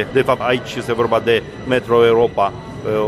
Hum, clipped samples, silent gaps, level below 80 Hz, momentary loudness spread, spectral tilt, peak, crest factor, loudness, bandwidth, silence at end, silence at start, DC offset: none; under 0.1%; none; -44 dBFS; 8 LU; -6 dB/octave; -2 dBFS; 14 dB; -17 LUFS; 13 kHz; 0 s; 0 s; under 0.1%